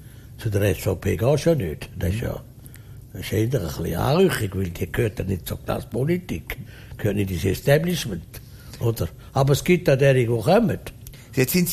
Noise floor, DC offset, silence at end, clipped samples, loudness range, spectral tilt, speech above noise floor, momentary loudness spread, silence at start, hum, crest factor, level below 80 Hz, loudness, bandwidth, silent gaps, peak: -42 dBFS; under 0.1%; 0 s; under 0.1%; 4 LU; -6 dB/octave; 20 dB; 17 LU; 0 s; none; 18 dB; -42 dBFS; -23 LUFS; 15.5 kHz; none; -4 dBFS